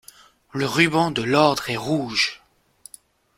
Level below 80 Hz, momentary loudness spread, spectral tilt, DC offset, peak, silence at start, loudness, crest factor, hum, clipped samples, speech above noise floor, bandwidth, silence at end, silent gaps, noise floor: -58 dBFS; 7 LU; -4.5 dB/octave; under 0.1%; -2 dBFS; 0.55 s; -20 LUFS; 20 dB; none; under 0.1%; 30 dB; 16.5 kHz; 1 s; none; -51 dBFS